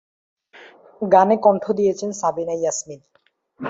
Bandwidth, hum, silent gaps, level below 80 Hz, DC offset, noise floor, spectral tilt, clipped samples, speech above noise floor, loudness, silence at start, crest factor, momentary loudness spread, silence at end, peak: 7.8 kHz; none; none; -66 dBFS; under 0.1%; -47 dBFS; -5 dB/octave; under 0.1%; 28 dB; -19 LUFS; 0.6 s; 20 dB; 13 LU; 0 s; -2 dBFS